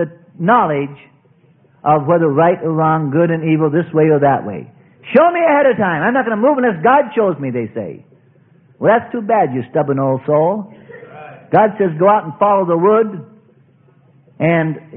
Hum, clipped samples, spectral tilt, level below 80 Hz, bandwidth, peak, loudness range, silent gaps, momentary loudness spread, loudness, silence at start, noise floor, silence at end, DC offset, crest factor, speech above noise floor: none; under 0.1%; -12 dB/octave; -58 dBFS; 3.7 kHz; 0 dBFS; 3 LU; none; 11 LU; -14 LUFS; 0 s; -51 dBFS; 0 s; under 0.1%; 16 dB; 37 dB